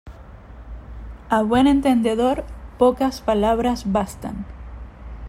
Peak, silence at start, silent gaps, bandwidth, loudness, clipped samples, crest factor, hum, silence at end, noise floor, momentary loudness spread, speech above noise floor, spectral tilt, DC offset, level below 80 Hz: -4 dBFS; 0.05 s; none; 15.5 kHz; -20 LUFS; under 0.1%; 16 dB; none; 0 s; -40 dBFS; 23 LU; 21 dB; -6 dB/octave; under 0.1%; -38 dBFS